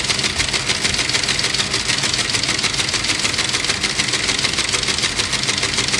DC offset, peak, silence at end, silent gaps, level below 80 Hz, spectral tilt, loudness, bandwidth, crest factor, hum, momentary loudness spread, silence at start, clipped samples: under 0.1%; -4 dBFS; 0 s; none; -40 dBFS; -1 dB/octave; -17 LUFS; 12 kHz; 16 dB; none; 1 LU; 0 s; under 0.1%